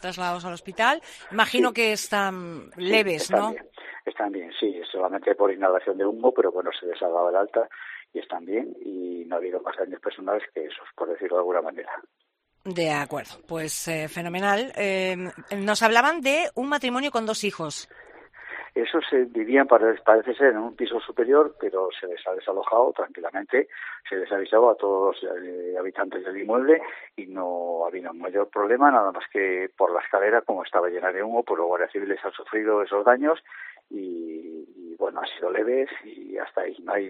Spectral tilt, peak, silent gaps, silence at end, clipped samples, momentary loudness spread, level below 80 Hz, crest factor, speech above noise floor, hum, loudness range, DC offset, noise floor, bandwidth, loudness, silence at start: -4 dB/octave; -2 dBFS; none; 0 s; under 0.1%; 15 LU; -70 dBFS; 22 dB; 36 dB; none; 7 LU; under 0.1%; -61 dBFS; 13 kHz; -24 LUFS; 0 s